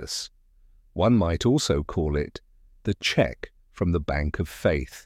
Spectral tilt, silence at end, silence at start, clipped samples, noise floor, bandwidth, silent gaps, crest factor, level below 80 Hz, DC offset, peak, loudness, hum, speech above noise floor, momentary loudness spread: -5.5 dB/octave; 0.05 s; 0 s; under 0.1%; -56 dBFS; 15.5 kHz; none; 18 dB; -38 dBFS; under 0.1%; -8 dBFS; -25 LUFS; none; 32 dB; 17 LU